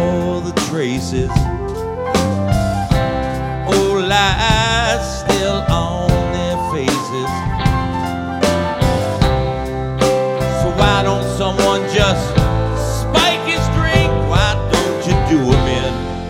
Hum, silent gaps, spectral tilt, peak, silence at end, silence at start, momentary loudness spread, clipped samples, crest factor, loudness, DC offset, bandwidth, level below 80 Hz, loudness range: none; none; -5 dB/octave; 0 dBFS; 0 s; 0 s; 7 LU; under 0.1%; 16 dB; -16 LUFS; under 0.1%; 16.5 kHz; -24 dBFS; 3 LU